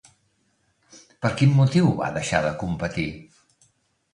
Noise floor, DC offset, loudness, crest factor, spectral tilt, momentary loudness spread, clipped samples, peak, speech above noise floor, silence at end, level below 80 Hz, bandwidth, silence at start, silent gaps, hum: -68 dBFS; under 0.1%; -22 LUFS; 20 dB; -6.5 dB/octave; 11 LU; under 0.1%; -4 dBFS; 47 dB; 0.9 s; -50 dBFS; 10.5 kHz; 0.95 s; none; none